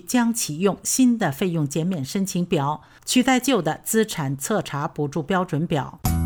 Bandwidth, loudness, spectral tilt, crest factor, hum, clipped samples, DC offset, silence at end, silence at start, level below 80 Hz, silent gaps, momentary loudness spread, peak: over 20 kHz; -22 LUFS; -4.5 dB/octave; 16 dB; none; under 0.1%; under 0.1%; 0 s; 0.1 s; -42 dBFS; none; 7 LU; -6 dBFS